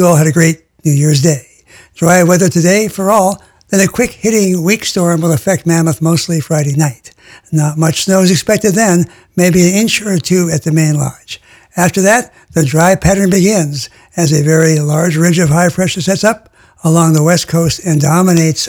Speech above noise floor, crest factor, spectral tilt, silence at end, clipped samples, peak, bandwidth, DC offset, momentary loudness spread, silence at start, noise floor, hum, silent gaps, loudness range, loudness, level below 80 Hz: 31 dB; 10 dB; -5 dB/octave; 0 s; 0.1%; 0 dBFS; 18.5 kHz; under 0.1%; 7 LU; 0 s; -42 dBFS; none; none; 2 LU; -11 LUFS; -40 dBFS